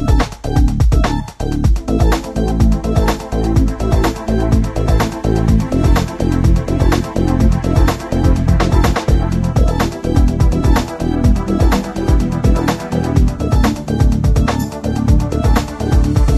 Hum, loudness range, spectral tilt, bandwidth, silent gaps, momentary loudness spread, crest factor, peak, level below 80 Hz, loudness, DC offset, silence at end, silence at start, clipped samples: none; 1 LU; -7 dB/octave; 13.5 kHz; none; 4 LU; 14 dB; 0 dBFS; -16 dBFS; -15 LUFS; under 0.1%; 0 s; 0 s; under 0.1%